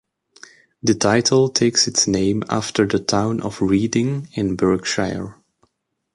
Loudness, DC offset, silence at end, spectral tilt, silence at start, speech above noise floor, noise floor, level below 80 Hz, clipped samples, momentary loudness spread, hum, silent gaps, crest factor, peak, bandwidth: -19 LUFS; under 0.1%; 0.8 s; -4 dB/octave; 0.85 s; 51 dB; -69 dBFS; -48 dBFS; under 0.1%; 8 LU; none; none; 16 dB; -4 dBFS; 11.5 kHz